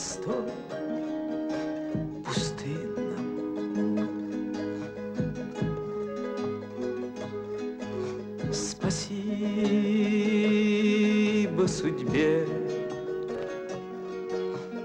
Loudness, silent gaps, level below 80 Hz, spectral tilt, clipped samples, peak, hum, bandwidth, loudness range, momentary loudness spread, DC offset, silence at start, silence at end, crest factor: -30 LUFS; none; -56 dBFS; -5.5 dB/octave; under 0.1%; -14 dBFS; none; 9.6 kHz; 8 LU; 11 LU; under 0.1%; 0 s; 0 s; 14 dB